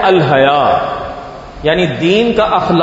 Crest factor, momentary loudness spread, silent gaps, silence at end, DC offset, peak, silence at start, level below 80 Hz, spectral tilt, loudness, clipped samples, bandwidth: 12 dB; 15 LU; none; 0 s; under 0.1%; 0 dBFS; 0 s; -38 dBFS; -6.5 dB/octave; -12 LUFS; under 0.1%; 8 kHz